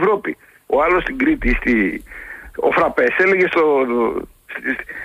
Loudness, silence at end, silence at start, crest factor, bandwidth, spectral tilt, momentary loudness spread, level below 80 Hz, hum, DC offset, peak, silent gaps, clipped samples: -17 LUFS; 0 s; 0 s; 12 dB; 15 kHz; -6.5 dB/octave; 16 LU; -34 dBFS; none; under 0.1%; -6 dBFS; none; under 0.1%